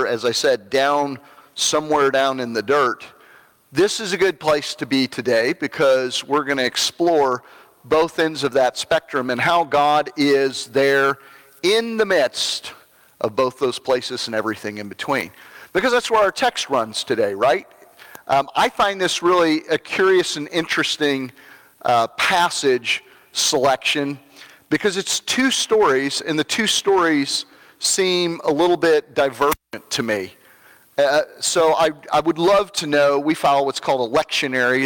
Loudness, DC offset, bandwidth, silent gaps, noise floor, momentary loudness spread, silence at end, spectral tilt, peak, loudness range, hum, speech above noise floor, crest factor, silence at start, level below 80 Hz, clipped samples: -19 LUFS; under 0.1%; 18 kHz; none; -51 dBFS; 8 LU; 0 s; -3 dB/octave; -6 dBFS; 3 LU; none; 32 dB; 14 dB; 0 s; -58 dBFS; under 0.1%